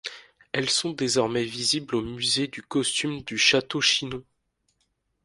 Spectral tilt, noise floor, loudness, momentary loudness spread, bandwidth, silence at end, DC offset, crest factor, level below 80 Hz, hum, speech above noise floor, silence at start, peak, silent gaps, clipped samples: -2.5 dB/octave; -74 dBFS; -24 LUFS; 10 LU; 11.5 kHz; 1.05 s; under 0.1%; 22 dB; -60 dBFS; none; 48 dB; 0.05 s; -6 dBFS; none; under 0.1%